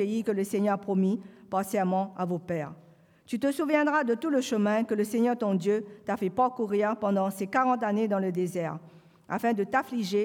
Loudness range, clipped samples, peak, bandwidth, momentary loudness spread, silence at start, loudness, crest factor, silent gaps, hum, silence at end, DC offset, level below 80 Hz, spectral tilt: 3 LU; under 0.1%; -10 dBFS; 17.5 kHz; 8 LU; 0 s; -28 LUFS; 16 dB; none; none; 0 s; under 0.1%; -76 dBFS; -6.5 dB/octave